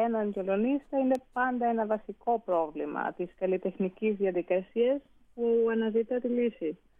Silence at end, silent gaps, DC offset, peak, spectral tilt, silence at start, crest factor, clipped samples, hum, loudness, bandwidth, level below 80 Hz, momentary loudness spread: 0.25 s; none; under 0.1%; -16 dBFS; -8.5 dB/octave; 0 s; 14 dB; under 0.1%; none; -30 LUFS; 5 kHz; -66 dBFS; 6 LU